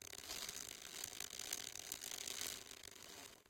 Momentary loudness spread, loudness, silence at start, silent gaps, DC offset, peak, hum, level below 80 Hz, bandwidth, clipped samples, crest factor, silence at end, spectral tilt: 9 LU; -47 LUFS; 0 s; none; under 0.1%; -24 dBFS; none; -76 dBFS; 17 kHz; under 0.1%; 26 dB; 0 s; 0.5 dB/octave